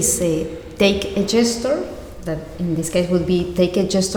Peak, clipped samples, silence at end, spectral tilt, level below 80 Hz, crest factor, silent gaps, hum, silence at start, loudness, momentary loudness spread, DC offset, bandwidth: -2 dBFS; under 0.1%; 0 s; -4.5 dB/octave; -40 dBFS; 16 dB; none; none; 0 s; -20 LUFS; 11 LU; under 0.1%; over 20 kHz